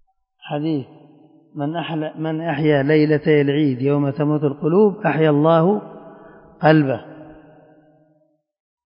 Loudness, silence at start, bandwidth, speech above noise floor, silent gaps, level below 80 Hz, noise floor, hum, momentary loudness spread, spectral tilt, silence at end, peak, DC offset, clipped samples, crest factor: -18 LUFS; 0.45 s; 5.4 kHz; 45 dB; none; -62 dBFS; -62 dBFS; none; 12 LU; -12.5 dB/octave; 1.55 s; 0 dBFS; under 0.1%; under 0.1%; 18 dB